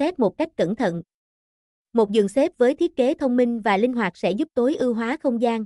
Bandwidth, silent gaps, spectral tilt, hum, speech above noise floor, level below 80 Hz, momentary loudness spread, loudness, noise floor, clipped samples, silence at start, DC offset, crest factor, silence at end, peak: 11.5 kHz; 1.14-1.85 s; -6.5 dB/octave; none; over 69 dB; -60 dBFS; 5 LU; -22 LUFS; under -90 dBFS; under 0.1%; 0 s; under 0.1%; 14 dB; 0 s; -8 dBFS